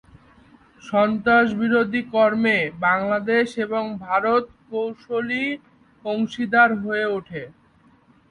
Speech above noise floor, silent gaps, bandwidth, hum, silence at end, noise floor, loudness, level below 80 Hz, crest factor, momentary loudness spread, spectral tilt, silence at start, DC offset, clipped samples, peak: 35 dB; none; 10.5 kHz; none; 0.8 s; -56 dBFS; -21 LUFS; -60 dBFS; 20 dB; 11 LU; -6.5 dB/octave; 0.85 s; under 0.1%; under 0.1%; -4 dBFS